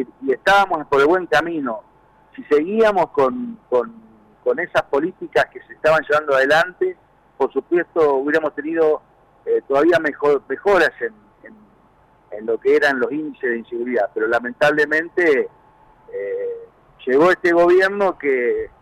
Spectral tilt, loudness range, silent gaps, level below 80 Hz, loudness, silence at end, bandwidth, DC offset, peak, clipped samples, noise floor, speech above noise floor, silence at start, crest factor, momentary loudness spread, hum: -5 dB/octave; 3 LU; none; -54 dBFS; -18 LUFS; 0.15 s; 14.5 kHz; under 0.1%; -8 dBFS; under 0.1%; -54 dBFS; 36 dB; 0 s; 12 dB; 11 LU; none